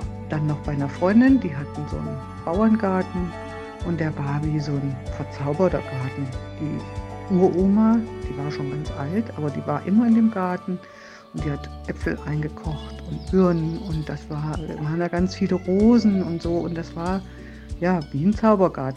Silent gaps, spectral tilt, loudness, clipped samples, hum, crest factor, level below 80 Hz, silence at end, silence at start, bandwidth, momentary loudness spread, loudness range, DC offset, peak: none; -8.5 dB/octave; -23 LUFS; under 0.1%; none; 18 dB; -40 dBFS; 0 s; 0 s; 9.6 kHz; 14 LU; 4 LU; under 0.1%; -4 dBFS